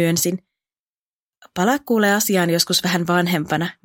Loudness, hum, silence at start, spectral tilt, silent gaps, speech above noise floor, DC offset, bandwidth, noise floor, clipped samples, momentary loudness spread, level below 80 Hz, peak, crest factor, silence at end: -18 LUFS; none; 0 s; -4 dB/octave; 0.79-1.42 s; over 71 dB; under 0.1%; 17 kHz; under -90 dBFS; under 0.1%; 7 LU; -62 dBFS; -2 dBFS; 18 dB; 0.15 s